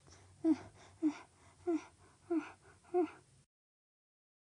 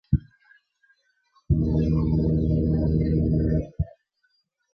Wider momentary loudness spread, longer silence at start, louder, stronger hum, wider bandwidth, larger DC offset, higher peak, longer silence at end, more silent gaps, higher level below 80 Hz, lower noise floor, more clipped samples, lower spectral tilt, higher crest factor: first, 18 LU vs 6 LU; first, 0.45 s vs 0.1 s; second, -39 LUFS vs -24 LUFS; neither; first, 10.5 kHz vs 5.2 kHz; neither; second, -22 dBFS vs -8 dBFS; first, 1.3 s vs 0.85 s; neither; second, -78 dBFS vs -32 dBFS; second, -61 dBFS vs -71 dBFS; neither; second, -6.5 dB/octave vs -12 dB/octave; about the same, 18 dB vs 18 dB